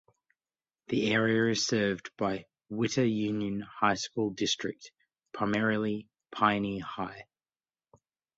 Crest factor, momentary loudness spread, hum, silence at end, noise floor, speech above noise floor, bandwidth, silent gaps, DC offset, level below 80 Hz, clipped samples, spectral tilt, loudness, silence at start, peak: 22 dB; 13 LU; none; 1.15 s; under -90 dBFS; over 60 dB; 8 kHz; none; under 0.1%; -66 dBFS; under 0.1%; -4.5 dB/octave; -30 LUFS; 0.9 s; -10 dBFS